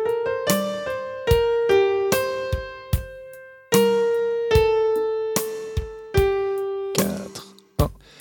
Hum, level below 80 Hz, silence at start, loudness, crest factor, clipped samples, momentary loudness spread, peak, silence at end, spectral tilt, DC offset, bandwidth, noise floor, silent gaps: none; -36 dBFS; 0 s; -22 LUFS; 20 dB; under 0.1%; 12 LU; -2 dBFS; 0.25 s; -5 dB/octave; under 0.1%; 19 kHz; -42 dBFS; none